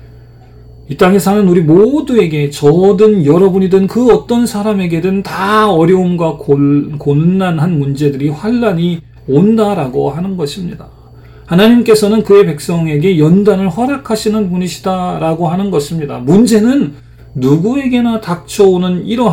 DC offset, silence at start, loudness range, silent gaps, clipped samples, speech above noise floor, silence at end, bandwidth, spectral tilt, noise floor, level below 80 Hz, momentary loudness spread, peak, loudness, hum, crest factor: under 0.1%; 0 s; 4 LU; none; under 0.1%; 26 dB; 0 s; 16.5 kHz; -7 dB/octave; -36 dBFS; -40 dBFS; 8 LU; 0 dBFS; -11 LUFS; none; 10 dB